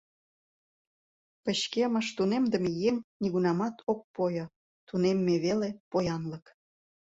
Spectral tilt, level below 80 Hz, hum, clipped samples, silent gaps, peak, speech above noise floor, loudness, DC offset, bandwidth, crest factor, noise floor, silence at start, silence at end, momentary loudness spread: -6 dB/octave; -66 dBFS; none; under 0.1%; 3.04-3.20 s, 3.83-3.87 s, 4.04-4.14 s, 4.56-4.87 s, 5.80-5.91 s; -14 dBFS; over 61 dB; -30 LUFS; under 0.1%; 8 kHz; 16 dB; under -90 dBFS; 1.45 s; 0.7 s; 9 LU